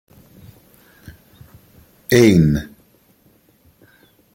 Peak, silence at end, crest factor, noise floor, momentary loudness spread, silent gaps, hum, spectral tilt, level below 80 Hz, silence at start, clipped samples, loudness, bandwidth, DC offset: 0 dBFS; 1.7 s; 20 dB; -56 dBFS; 25 LU; none; none; -6.5 dB/octave; -42 dBFS; 2.1 s; under 0.1%; -14 LUFS; 17 kHz; under 0.1%